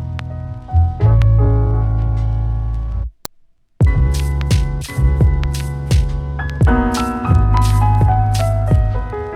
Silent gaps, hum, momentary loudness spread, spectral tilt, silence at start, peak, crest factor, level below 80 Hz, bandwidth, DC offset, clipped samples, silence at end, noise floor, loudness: none; none; 10 LU; -7 dB/octave; 0 s; 0 dBFS; 14 dB; -18 dBFS; 18 kHz; under 0.1%; under 0.1%; 0 s; -50 dBFS; -16 LUFS